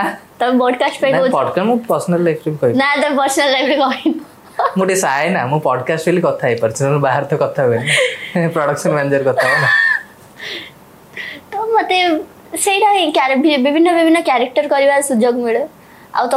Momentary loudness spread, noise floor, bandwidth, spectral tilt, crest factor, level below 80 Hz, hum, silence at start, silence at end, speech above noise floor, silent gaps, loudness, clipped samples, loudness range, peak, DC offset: 10 LU; -37 dBFS; 16 kHz; -4.5 dB/octave; 12 dB; -64 dBFS; none; 0 s; 0 s; 23 dB; none; -14 LUFS; under 0.1%; 3 LU; -4 dBFS; under 0.1%